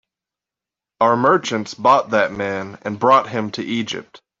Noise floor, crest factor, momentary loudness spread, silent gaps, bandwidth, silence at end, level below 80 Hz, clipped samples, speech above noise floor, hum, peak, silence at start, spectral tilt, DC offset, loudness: -88 dBFS; 18 dB; 11 LU; none; 7.8 kHz; 0.25 s; -62 dBFS; under 0.1%; 70 dB; none; -2 dBFS; 1 s; -5 dB/octave; under 0.1%; -18 LUFS